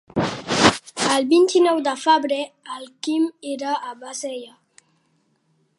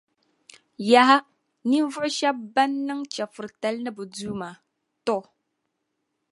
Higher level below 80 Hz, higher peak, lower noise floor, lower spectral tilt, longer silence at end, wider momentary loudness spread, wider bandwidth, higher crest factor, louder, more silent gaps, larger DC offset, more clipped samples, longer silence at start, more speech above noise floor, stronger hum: first, -54 dBFS vs -70 dBFS; about the same, 0 dBFS vs -2 dBFS; second, -66 dBFS vs -78 dBFS; about the same, -3.5 dB/octave vs -3.5 dB/octave; first, 1.3 s vs 1.1 s; about the same, 15 LU vs 16 LU; about the same, 11.5 kHz vs 11.5 kHz; about the same, 22 dB vs 24 dB; first, -20 LUFS vs -24 LUFS; neither; neither; neither; second, 0.15 s vs 0.8 s; second, 45 dB vs 55 dB; neither